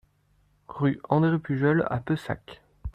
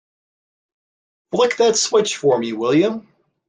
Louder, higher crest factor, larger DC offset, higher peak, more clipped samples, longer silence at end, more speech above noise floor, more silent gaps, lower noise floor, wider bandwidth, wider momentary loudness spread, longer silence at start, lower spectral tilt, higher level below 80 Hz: second, -26 LUFS vs -18 LUFS; about the same, 20 dB vs 16 dB; neither; second, -8 dBFS vs -4 dBFS; neither; second, 0.05 s vs 0.5 s; second, 40 dB vs over 73 dB; neither; second, -65 dBFS vs under -90 dBFS; about the same, 9.4 kHz vs 10 kHz; first, 13 LU vs 7 LU; second, 0.7 s vs 1.3 s; first, -9 dB/octave vs -3.5 dB/octave; first, -48 dBFS vs -68 dBFS